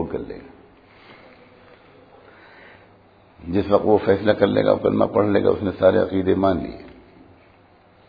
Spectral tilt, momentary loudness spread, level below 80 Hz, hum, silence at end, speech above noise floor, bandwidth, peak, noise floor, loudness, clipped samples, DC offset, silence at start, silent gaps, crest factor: -10 dB/octave; 16 LU; -50 dBFS; none; 1.2 s; 34 dB; 5 kHz; -2 dBFS; -53 dBFS; -19 LUFS; under 0.1%; under 0.1%; 0 s; none; 22 dB